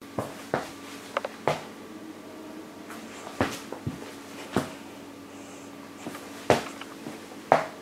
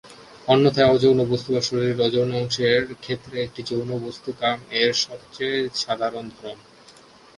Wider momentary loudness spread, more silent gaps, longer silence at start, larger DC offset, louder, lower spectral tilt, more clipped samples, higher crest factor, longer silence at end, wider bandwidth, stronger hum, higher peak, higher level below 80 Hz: first, 17 LU vs 14 LU; neither; about the same, 0 s vs 0.05 s; neither; second, -33 LUFS vs -22 LUFS; about the same, -4.5 dB/octave vs -5 dB/octave; neither; first, 30 dB vs 20 dB; second, 0 s vs 0.8 s; first, 16 kHz vs 11.5 kHz; neither; about the same, -2 dBFS vs -2 dBFS; second, -62 dBFS vs -56 dBFS